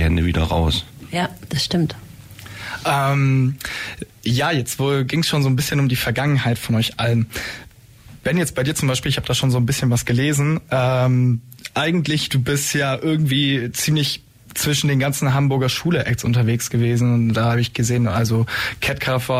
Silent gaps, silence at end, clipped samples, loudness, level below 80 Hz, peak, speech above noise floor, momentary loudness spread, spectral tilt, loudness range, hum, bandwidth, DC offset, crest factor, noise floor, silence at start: none; 0 s; under 0.1%; -19 LUFS; -38 dBFS; -8 dBFS; 25 dB; 8 LU; -5 dB/octave; 3 LU; none; 16 kHz; under 0.1%; 12 dB; -44 dBFS; 0 s